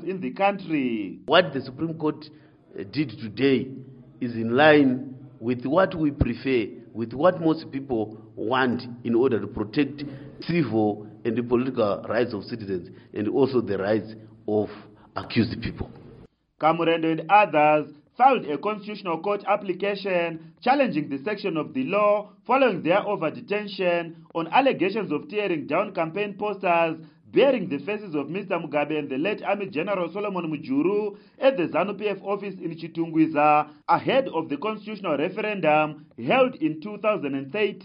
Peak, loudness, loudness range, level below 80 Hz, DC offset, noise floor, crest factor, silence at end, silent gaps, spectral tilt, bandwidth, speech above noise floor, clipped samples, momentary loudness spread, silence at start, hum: -2 dBFS; -24 LUFS; 4 LU; -52 dBFS; under 0.1%; -51 dBFS; 22 dB; 0 s; none; -4.5 dB/octave; 5.4 kHz; 27 dB; under 0.1%; 12 LU; 0 s; none